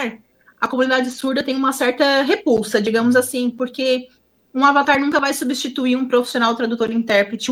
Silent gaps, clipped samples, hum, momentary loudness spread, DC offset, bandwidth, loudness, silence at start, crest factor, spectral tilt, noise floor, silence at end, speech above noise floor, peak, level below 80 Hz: none; under 0.1%; none; 7 LU; under 0.1%; 16.5 kHz; -18 LUFS; 0 s; 18 dB; -3.5 dB/octave; -44 dBFS; 0 s; 27 dB; 0 dBFS; -60 dBFS